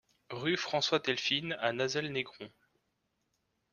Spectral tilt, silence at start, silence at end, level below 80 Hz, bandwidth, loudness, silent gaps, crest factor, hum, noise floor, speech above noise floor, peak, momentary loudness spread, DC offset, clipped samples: -3.5 dB/octave; 0.3 s; 1.25 s; -74 dBFS; 10 kHz; -33 LUFS; none; 24 dB; none; -80 dBFS; 47 dB; -12 dBFS; 14 LU; under 0.1%; under 0.1%